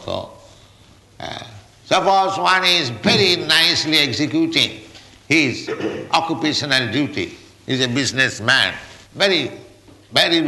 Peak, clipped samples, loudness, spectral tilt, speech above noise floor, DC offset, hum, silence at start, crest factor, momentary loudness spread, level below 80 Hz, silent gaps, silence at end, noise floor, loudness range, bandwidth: -2 dBFS; under 0.1%; -17 LUFS; -3.5 dB/octave; 31 dB; under 0.1%; none; 0 s; 16 dB; 17 LU; -56 dBFS; none; 0 s; -48 dBFS; 4 LU; 12 kHz